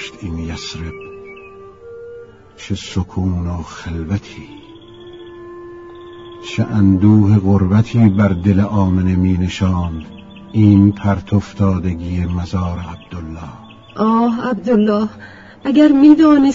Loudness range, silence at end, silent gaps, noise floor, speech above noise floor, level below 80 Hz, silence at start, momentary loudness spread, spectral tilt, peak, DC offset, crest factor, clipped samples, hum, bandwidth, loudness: 12 LU; 0 s; none; -37 dBFS; 23 dB; -38 dBFS; 0 s; 24 LU; -8 dB/octave; 0 dBFS; 0.2%; 16 dB; under 0.1%; none; 7.8 kHz; -15 LUFS